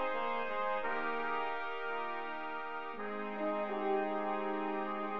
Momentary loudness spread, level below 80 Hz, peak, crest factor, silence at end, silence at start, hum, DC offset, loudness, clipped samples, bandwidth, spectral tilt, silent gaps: 6 LU; -78 dBFS; -24 dBFS; 14 dB; 0 s; 0 s; none; 0.4%; -37 LUFS; under 0.1%; 6.6 kHz; -6.5 dB/octave; none